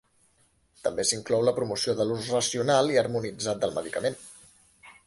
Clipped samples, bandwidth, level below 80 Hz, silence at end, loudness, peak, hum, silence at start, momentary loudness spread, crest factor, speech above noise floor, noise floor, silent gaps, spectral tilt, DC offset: under 0.1%; 11.5 kHz; -62 dBFS; 0.15 s; -27 LUFS; -10 dBFS; none; 0.85 s; 9 LU; 18 dB; 40 dB; -66 dBFS; none; -3.5 dB/octave; under 0.1%